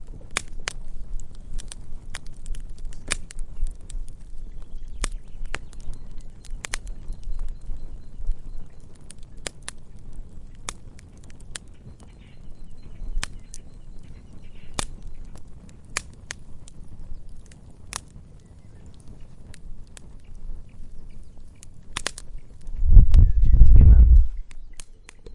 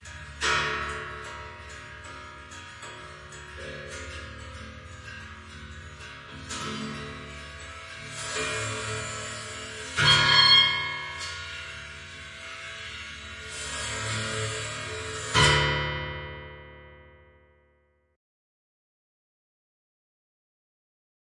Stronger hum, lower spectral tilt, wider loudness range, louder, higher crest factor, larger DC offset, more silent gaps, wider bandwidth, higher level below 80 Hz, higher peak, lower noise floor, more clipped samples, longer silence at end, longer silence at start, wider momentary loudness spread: neither; first, -4.5 dB/octave vs -2.5 dB/octave; first, 23 LU vs 19 LU; about the same, -24 LUFS vs -25 LUFS; about the same, 22 dB vs 24 dB; neither; neither; about the same, 11.5 kHz vs 11.5 kHz; first, -24 dBFS vs -50 dBFS; first, 0 dBFS vs -6 dBFS; second, -45 dBFS vs -67 dBFS; neither; second, 0 s vs 4 s; about the same, 0 s vs 0 s; first, 28 LU vs 22 LU